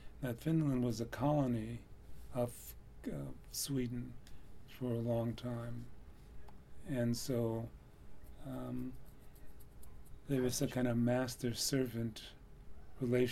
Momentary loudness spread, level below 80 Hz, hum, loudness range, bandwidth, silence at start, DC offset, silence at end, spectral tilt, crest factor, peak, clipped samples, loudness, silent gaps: 24 LU; -56 dBFS; none; 5 LU; 16.5 kHz; 0 s; under 0.1%; 0 s; -5.5 dB/octave; 18 dB; -22 dBFS; under 0.1%; -38 LUFS; none